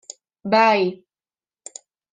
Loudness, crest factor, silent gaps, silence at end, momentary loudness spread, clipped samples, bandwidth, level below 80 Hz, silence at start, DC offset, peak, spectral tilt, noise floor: -18 LUFS; 20 dB; none; 1.2 s; 23 LU; under 0.1%; 9.8 kHz; -74 dBFS; 0.45 s; under 0.1%; -2 dBFS; -4 dB/octave; under -90 dBFS